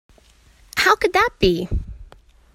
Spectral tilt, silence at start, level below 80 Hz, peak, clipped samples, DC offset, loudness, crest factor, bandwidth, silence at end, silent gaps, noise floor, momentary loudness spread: -4.5 dB/octave; 0.75 s; -34 dBFS; 0 dBFS; under 0.1%; under 0.1%; -19 LUFS; 22 dB; 16 kHz; 0.5 s; none; -52 dBFS; 13 LU